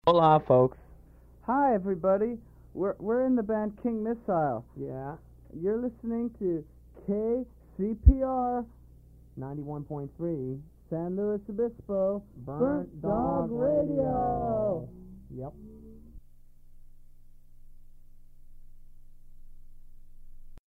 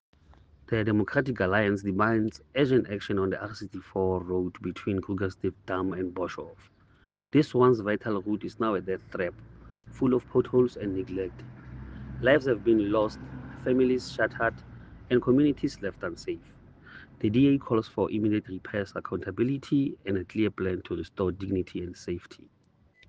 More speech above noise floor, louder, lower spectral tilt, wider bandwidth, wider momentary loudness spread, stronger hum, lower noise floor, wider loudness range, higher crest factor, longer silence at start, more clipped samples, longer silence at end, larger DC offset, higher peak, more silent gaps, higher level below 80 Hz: second, 26 dB vs 36 dB; about the same, -29 LUFS vs -28 LUFS; first, -10 dB/octave vs -7.5 dB/octave; second, 5.4 kHz vs 8 kHz; first, 19 LU vs 13 LU; first, 60 Hz at -55 dBFS vs none; second, -54 dBFS vs -63 dBFS; about the same, 6 LU vs 4 LU; about the same, 24 dB vs 22 dB; second, 0.05 s vs 0.7 s; neither; second, 0.1 s vs 0.75 s; neither; about the same, -4 dBFS vs -6 dBFS; neither; first, -38 dBFS vs -54 dBFS